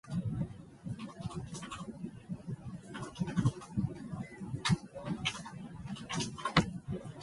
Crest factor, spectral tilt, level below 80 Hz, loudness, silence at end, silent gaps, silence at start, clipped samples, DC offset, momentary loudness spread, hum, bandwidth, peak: 26 dB; -5 dB/octave; -56 dBFS; -38 LUFS; 0 s; none; 0.05 s; under 0.1%; under 0.1%; 13 LU; none; 11.5 kHz; -12 dBFS